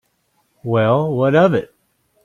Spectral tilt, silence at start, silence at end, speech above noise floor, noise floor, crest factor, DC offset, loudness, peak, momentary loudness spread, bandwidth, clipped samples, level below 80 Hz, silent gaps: -8.5 dB/octave; 0.65 s; 0.6 s; 50 dB; -65 dBFS; 16 dB; under 0.1%; -16 LUFS; -2 dBFS; 9 LU; 9.6 kHz; under 0.1%; -56 dBFS; none